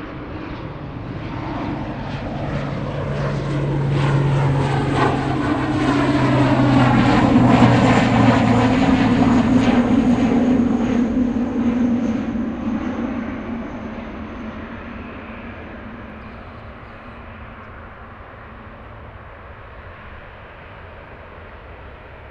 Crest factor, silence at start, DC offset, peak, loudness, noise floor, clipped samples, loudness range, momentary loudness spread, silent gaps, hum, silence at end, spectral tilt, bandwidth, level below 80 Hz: 20 dB; 0 s; under 0.1%; 0 dBFS; -18 LUFS; -38 dBFS; under 0.1%; 23 LU; 24 LU; none; none; 0 s; -7.5 dB/octave; 9.2 kHz; -36 dBFS